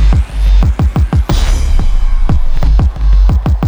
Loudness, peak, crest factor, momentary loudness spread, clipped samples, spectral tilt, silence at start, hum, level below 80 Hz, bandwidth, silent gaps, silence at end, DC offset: -13 LUFS; 0 dBFS; 8 dB; 4 LU; under 0.1%; -6.5 dB/octave; 0 s; none; -8 dBFS; over 20 kHz; none; 0 s; under 0.1%